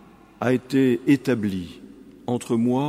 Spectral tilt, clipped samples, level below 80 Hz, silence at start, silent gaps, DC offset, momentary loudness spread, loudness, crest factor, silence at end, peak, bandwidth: -7 dB/octave; under 0.1%; -60 dBFS; 0.4 s; none; under 0.1%; 12 LU; -23 LUFS; 18 dB; 0 s; -6 dBFS; 15 kHz